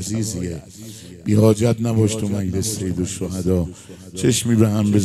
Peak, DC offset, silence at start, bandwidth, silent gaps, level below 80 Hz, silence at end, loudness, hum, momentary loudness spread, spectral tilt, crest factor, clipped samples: -2 dBFS; under 0.1%; 0 s; 14.5 kHz; none; -50 dBFS; 0 s; -20 LUFS; none; 18 LU; -6 dB/octave; 18 dB; under 0.1%